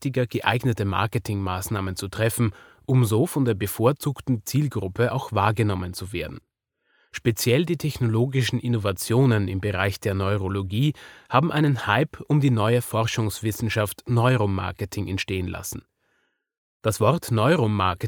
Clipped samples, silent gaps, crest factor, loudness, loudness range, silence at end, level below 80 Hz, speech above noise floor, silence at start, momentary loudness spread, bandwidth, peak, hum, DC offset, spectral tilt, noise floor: under 0.1%; 16.58-16.80 s; 20 dB; -24 LUFS; 3 LU; 0 s; -54 dBFS; 48 dB; 0 s; 8 LU; over 20 kHz; -4 dBFS; none; under 0.1%; -6 dB/octave; -71 dBFS